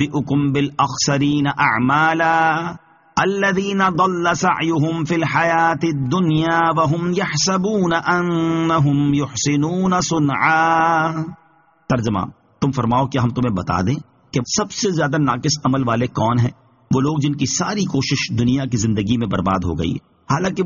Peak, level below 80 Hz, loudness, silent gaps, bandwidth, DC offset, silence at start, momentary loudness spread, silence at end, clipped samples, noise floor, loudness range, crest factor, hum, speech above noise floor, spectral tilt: -2 dBFS; -46 dBFS; -18 LUFS; none; 7.4 kHz; under 0.1%; 0 s; 7 LU; 0 s; under 0.1%; -41 dBFS; 3 LU; 16 dB; none; 23 dB; -5 dB/octave